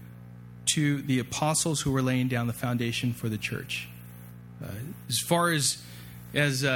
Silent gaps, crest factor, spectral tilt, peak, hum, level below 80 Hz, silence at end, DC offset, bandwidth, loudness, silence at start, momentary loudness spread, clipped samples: none; 20 dB; -4 dB/octave; -10 dBFS; 60 Hz at -45 dBFS; -56 dBFS; 0 s; under 0.1%; 18.5 kHz; -28 LUFS; 0 s; 20 LU; under 0.1%